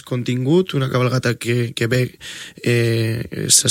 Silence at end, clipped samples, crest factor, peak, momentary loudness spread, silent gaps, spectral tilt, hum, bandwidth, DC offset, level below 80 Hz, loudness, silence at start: 0 s; under 0.1%; 18 dB; 0 dBFS; 9 LU; none; -4 dB/octave; none; 16.5 kHz; under 0.1%; -52 dBFS; -19 LUFS; 0.05 s